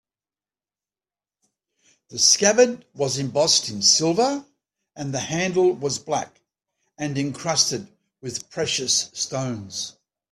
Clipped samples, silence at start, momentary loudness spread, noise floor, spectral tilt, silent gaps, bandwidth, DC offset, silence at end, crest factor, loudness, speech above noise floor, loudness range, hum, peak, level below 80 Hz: under 0.1%; 2.1 s; 16 LU; under -90 dBFS; -2.5 dB/octave; none; 14 kHz; under 0.1%; 0.4 s; 22 dB; -21 LUFS; over 68 dB; 6 LU; none; -2 dBFS; -64 dBFS